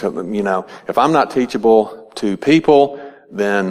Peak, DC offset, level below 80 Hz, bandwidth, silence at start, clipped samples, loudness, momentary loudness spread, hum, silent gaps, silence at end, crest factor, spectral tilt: 0 dBFS; under 0.1%; -54 dBFS; 12.5 kHz; 0 s; under 0.1%; -16 LUFS; 11 LU; none; none; 0 s; 16 dB; -6 dB/octave